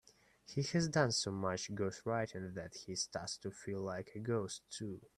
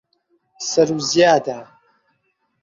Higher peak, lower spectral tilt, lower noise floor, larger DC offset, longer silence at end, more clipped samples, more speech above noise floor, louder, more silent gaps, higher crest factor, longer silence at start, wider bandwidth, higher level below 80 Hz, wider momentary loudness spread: second, -18 dBFS vs -2 dBFS; about the same, -4.5 dB/octave vs -3.5 dB/octave; second, -62 dBFS vs -69 dBFS; neither; second, 0.1 s vs 1 s; neither; second, 22 dB vs 52 dB; second, -39 LUFS vs -17 LUFS; neither; about the same, 22 dB vs 20 dB; about the same, 0.5 s vs 0.6 s; first, 13 kHz vs 7.8 kHz; second, -70 dBFS vs -62 dBFS; second, 12 LU vs 15 LU